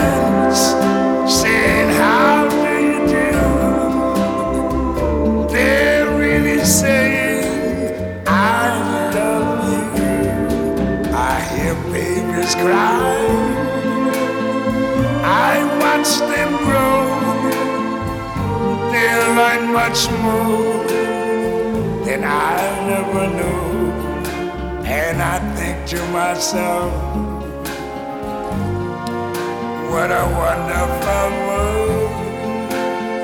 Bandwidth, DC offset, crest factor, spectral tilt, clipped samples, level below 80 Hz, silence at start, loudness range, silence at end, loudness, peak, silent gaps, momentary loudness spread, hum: 18 kHz; under 0.1%; 16 dB; -4.5 dB/octave; under 0.1%; -32 dBFS; 0 s; 6 LU; 0 s; -17 LUFS; -2 dBFS; none; 9 LU; none